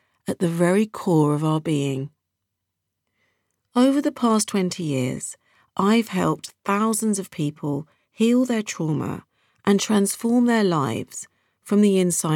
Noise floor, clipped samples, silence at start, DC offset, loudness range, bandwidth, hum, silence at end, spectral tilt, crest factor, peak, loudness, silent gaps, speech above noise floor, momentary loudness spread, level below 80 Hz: -80 dBFS; under 0.1%; 0.25 s; under 0.1%; 3 LU; 17 kHz; none; 0 s; -5.5 dB/octave; 16 dB; -6 dBFS; -22 LUFS; none; 59 dB; 12 LU; -66 dBFS